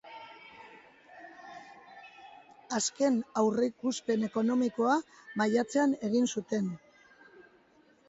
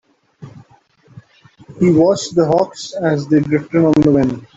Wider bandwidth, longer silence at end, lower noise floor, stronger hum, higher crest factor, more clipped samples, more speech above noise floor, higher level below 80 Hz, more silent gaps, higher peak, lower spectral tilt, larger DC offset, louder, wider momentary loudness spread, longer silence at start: about the same, 8.2 kHz vs 8 kHz; first, 1.3 s vs 0.15 s; first, -64 dBFS vs -51 dBFS; neither; about the same, 18 dB vs 14 dB; neither; about the same, 34 dB vs 37 dB; second, -76 dBFS vs -48 dBFS; neither; second, -14 dBFS vs -2 dBFS; second, -4.5 dB/octave vs -7 dB/octave; neither; second, -30 LUFS vs -15 LUFS; first, 23 LU vs 7 LU; second, 0.05 s vs 0.4 s